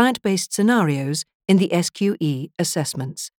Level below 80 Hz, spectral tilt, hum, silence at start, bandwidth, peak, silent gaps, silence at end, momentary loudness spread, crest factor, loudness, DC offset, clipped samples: -68 dBFS; -5 dB/octave; none; 0 s; 18.5 kHz; -2 dBFS; 1.35-1.40 s; 0.1 s; 8 LU; 18 dB; -21 LUFS; under 0.1%; under 0.1%